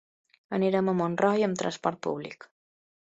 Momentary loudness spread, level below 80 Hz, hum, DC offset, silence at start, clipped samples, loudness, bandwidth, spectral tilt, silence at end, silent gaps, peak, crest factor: 12 LU; -72 dBFS; none; under 0.1%; 0.5 s; under 0.1%; -28 LUFS; 8.2 kHz; -6 dB/octave; 0.8 s; none; -10 dBFS; 20 dB